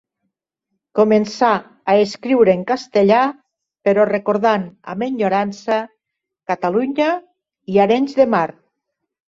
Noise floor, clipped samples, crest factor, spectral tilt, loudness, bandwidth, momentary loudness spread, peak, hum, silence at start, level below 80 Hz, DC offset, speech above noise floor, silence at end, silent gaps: -81 dBFS; under 0.1%; 16 dB; -6.5 dB/octave; -17 LUFS; 7.8 kHz; 10 LU; -2 dBFS; none; 0.95 s; -62 dBFS; under 0.1%; 65 dB; 0.8 s; none